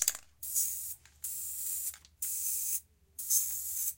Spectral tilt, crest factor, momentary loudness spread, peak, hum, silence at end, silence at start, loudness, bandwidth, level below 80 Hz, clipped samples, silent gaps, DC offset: 2.5 dB/octave; 30 dB; 13 LU; -6 dBFS; none; 0 s; 0 s; -33 LUFS; 17 kHz; -68 dBFS; under 0.1%; none; under 0.1%